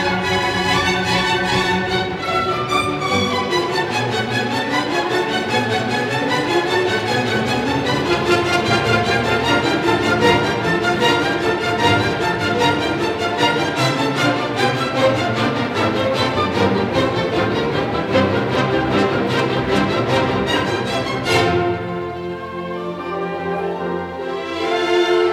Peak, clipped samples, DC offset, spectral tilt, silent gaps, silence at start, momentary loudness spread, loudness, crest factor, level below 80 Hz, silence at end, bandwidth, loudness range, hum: -2 dBFS; under 0.1%; under 0.1%; -5 dB/octave; none; 0 s; 7 LU; -18 LUFS; 16 dB; -44 dBFS; 0 s; 16 kHz; 3 LU; none